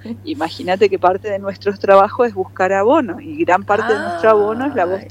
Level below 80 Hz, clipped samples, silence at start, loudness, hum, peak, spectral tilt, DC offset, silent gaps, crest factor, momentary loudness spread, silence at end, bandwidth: -56 dBFS; under 0.1%; 0.05 s; -16 LUFS; none; 0 dBFS; -6 dB/octave; under 0.1%; none; 16 dB; 11 LU; 0 s; 11.5 kHz